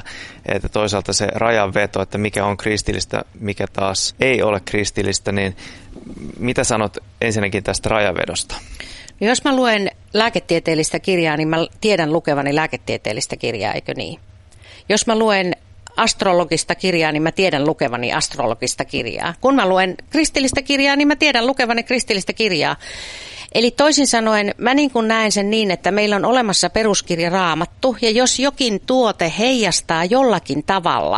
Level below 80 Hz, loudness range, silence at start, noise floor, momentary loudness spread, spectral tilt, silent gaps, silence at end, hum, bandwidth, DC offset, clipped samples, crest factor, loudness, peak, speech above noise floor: -42 dBFS; 4 LU; 0.05 s; -43 dBFS; 10 LU; -3.5 dB/octave; none; 0 s; none; 11.5 kHz; under 0.1%; under 0.1%; 18 dB; -17 LUFS; 0 dBFS; 25 dB